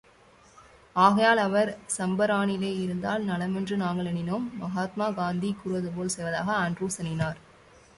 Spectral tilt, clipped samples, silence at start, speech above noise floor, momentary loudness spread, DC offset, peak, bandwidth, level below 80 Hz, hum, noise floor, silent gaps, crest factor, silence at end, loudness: -5 dB/octave; under 0.1%; 0.6 s; 30 dB; 10 LU; under 0.1%; -6 dBFS; 11.5 kHz; -60 dBFS; none; -57 dBFS; none; 22 dB; 0.6 s; -27 LUFS